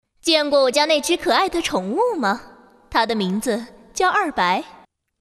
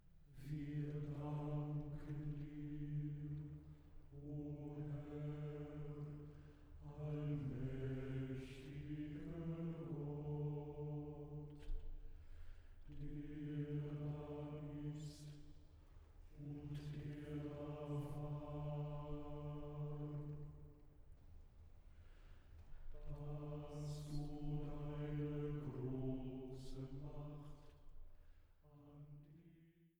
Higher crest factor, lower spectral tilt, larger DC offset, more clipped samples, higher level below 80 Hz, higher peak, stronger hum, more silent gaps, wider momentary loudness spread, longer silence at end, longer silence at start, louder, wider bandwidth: about the same, 18 dB vs 16 dB; second, -3 dB/octave vs -9 dB/octave; neither; neither; first, -52 dBFS vs -58 dBFS; first, -2 dBFS vs -34 dBFS; neither; neither; second, 8 LU vs 20 LU; first, 0.5 s vs 0.1 s; first, 0.25 s vs 0 s; first, -20 LUFS vs -49 LUFS; second, 14 kHz vs over 20 kHz